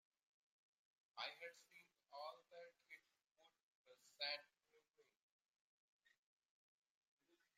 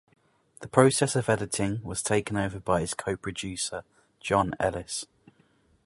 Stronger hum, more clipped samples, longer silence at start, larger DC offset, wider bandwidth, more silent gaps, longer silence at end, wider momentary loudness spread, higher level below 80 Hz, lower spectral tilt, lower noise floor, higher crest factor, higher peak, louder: neither; neither; first, 1.15 s vs 0.6 s; neither; first, 15.5 kHz vs 11.5 kHz; first, 3.31-3.35 s, 3.63-3.84 s, 5.22-5.39 s, 5.48-6.00 s, 6.18-7.17 s vs none; second, 0.2 s vs 0.8 s; first, 18 LU vs 13 LU; second, under -90 dBFS vs -52 dBFS; second, 0 dB/octave vs -4.5 dB/octave; first, -82 dBFS vs -65 dBFS; about the same, 26 dB vs 26 dB; second, -34 dBFS vs -2 dBFS; second, -53 LUFS vs -27 LUFS